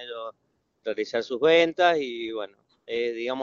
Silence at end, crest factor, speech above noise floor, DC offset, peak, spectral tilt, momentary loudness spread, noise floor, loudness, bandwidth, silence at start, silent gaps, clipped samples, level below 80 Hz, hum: 0 s; 20 dB; 48 dB; under 0.1%; -6 dBFS; -1.5 dB/octave; 17 LU; -72 dBFS; -25 LUFS; 7.4 kHz; 0 s; none; under 0.1%; -70 dBFS; none